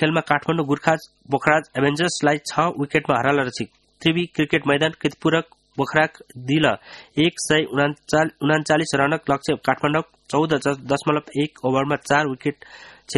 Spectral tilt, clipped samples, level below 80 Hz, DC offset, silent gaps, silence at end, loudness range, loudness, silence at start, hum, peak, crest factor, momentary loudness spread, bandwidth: -5 dB/octave; under 0.1%; -56 dBFS; under 0.1%; none; 0 s; 1 LU; -21 LUFS; 0 s; none; 0 dBFS; 22 dB; 7 LU; 12 kHz